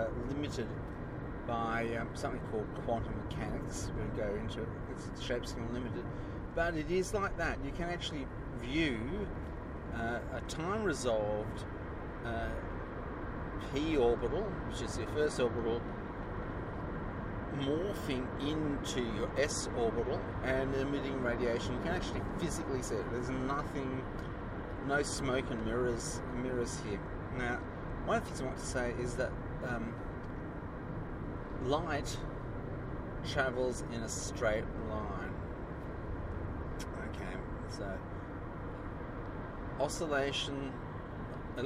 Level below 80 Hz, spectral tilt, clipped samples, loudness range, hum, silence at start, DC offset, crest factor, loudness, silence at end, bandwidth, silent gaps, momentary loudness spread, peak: -46 dBFS; -5.5 dB/octave; under 0.1%; 4 LU; none; 0 s; under 0.1%; 20 dB; -38 LUFS; 0 s; 15 kHz; none; 9 LU; -18 dBFS